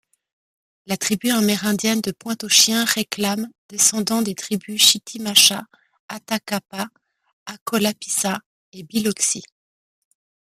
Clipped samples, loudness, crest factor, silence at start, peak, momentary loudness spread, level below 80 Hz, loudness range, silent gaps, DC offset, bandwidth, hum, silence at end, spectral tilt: under 0.1%; -19 LUFS; 22 dB; 0.9 s; 0 dBFS; 17 LU; -66 dBFS; 7 LU; 3.58-3.69 s, 6.00-6.09 s, 7.33-7.46 s, 7.61-7.66 s, 8.46-8.72 s; under 0.1%; 15.5 kHz; none; 1.05 s; -2 dB/octave